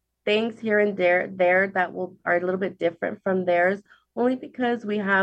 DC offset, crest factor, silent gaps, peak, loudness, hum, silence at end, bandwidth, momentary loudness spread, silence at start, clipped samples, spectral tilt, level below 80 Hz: under 0.1%; 16 dB; none; -8 dBFS; -24 LUFS; none; 0 s; 8.2 kHz; 7 LU; 0.25 s; under 0.1%; -7 dB/octave; -74 dBFS